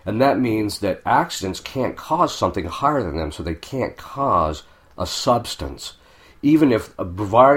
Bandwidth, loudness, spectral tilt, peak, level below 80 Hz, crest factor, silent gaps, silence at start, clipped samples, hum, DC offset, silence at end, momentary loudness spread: 16.5 kHz; -21 LUFS; -5.5 dB/octave; 0 dBFS; -42 dBFS; 20 dB; none; 0.05 s; under 0.1%; none; under 0.1%; 0 s; 12 LU